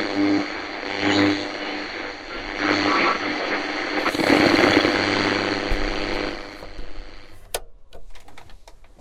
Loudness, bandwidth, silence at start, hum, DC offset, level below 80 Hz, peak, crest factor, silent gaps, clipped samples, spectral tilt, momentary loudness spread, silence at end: -21 LUFS; 15.5 kHz; 0 s; none; under 0.1%; -38 dBFS; -2 dBFS; 22 dB; none; under 0.1%; -4 dB/octave; 16 LU; 0.15 s